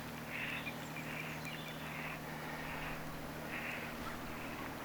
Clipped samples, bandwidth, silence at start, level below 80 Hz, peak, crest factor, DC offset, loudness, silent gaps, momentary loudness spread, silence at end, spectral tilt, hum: under 0.1%; over 20 kHz; 0 s; -60 dBFS; -28 dBFS; 14 dB; under 0.1%; -43 LUFS; none; 4 LU; 0 s; -4.5 dB/octave; none